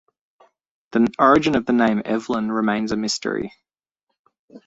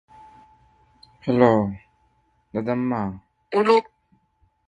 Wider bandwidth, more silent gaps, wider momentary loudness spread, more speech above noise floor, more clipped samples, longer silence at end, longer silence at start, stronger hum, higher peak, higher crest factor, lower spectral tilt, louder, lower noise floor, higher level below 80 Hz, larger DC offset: second, 8 kHz vs 10 kHz; first, 3.91-3.95 s, 4.03-4.07 s, 4.19-4.25 s, 4.39-4.48 s vs none; second, 11 LU vs 15 LU; first, 59 dB vs 45 dB; neither; second, 0.1 s vs 0.85 s; second, 0.95 s vs 1.25 s; neither; about the same, -2 dBFS vs -2 dBFS; about the same, 20 dB vs 24 dB; second, -5 dB/octave vs -8 dB/octave; about the same, -20 LUFS vs -22 LUFS; first, -79 dBFS vs -65 dBFS; about the same, -54 dBFS vs -56 dBFS; neither